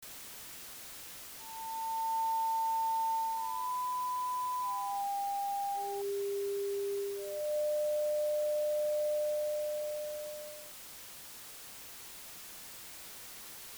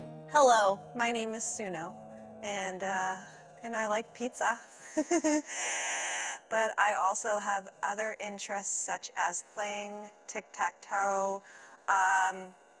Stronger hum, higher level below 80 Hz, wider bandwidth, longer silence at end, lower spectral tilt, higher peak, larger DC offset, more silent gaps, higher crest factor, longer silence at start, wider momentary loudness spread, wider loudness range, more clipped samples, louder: neither; about the same, -74 dBFS vs -78 dBFS; first, over 20 kHz vs 12 kHz; second, 0 s vs 0.3 s; about the same, -2 dB/octave vs -2 dB/octave; second, -28 dBFS vs -12 dBFS; neither; neither; second, 8 dB vs 20 dB; about the same, 0 s vs 0 s; about the same, 13 LU vs 15 LU; first, 9 LU vs 5 LU; neither; second, -36 LUFS vs -32 LUFS